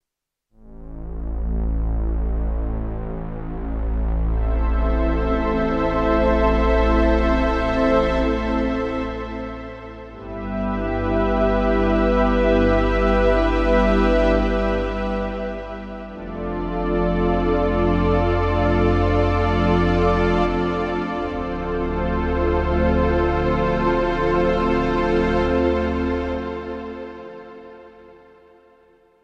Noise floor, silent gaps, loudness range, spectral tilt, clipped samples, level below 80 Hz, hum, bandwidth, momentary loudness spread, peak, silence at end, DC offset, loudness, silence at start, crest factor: -84 dBFS; none; 7 LU; -8 dB/octave; under 0.1%; -26 dBFS; none; 7 kHz; 13 LU; -4 dBFS; 1.15 s; under 0.1%; -21 LUFS; 0.65 s; 16 dB